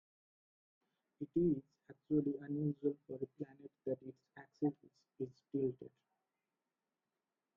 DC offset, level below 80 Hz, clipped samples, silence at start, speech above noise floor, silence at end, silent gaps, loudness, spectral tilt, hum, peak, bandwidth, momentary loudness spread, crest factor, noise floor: under 0.1%; -74 dBFS; under 0.1%; 1.2 s; over 49 dB; 1.7 s; none; -41 LUFS; -11.5 dB/octave; none; -24 dBFS; 5.8 kHz; 19 LU; 20 dB; under -90 dBFS